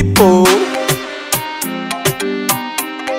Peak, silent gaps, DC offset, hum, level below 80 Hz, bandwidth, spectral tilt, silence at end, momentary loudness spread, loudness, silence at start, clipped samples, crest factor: 0 dBFS; none; under 0.1%; none; -40 dBFS; 16.5 kHz; -4 dB/octave; 0 s; 11 LU; -14 LUFS; 0 s; under 0.1%; 14 dB